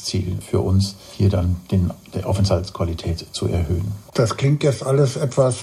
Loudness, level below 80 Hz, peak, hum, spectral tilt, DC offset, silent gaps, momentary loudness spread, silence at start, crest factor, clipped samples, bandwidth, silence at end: -21 LUFS; -38 dBFS; -4 dBFS; none; -6.5 dB/octave; under 0.1%; none; 7 LU; 0 s; 16 dB; under 0.1%; 13.5 kHz; 0 s